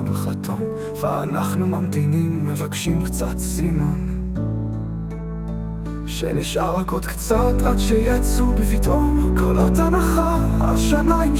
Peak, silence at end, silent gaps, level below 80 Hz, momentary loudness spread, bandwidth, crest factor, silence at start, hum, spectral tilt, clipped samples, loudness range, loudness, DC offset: -4 dBFS; 0 s; none; -24 dBFS; 10 LU; 17 kHz; 16 dB; 0 s; none; -6.5 dB/octave; under 0.1%; 6 LU; -21 LUFS; under 0.1%